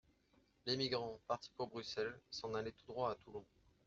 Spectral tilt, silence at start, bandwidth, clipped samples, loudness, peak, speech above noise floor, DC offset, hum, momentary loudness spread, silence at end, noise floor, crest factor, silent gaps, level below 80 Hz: -3 dB/octave; 0.65 s; 7.6 kHz; under 0.1%; -44 LUFS; -24 dBFS; 31 dB; under 0.1%; none; 10 LU; 0.4 s; -75 dBFS; 22 dB; none; -74 dBFS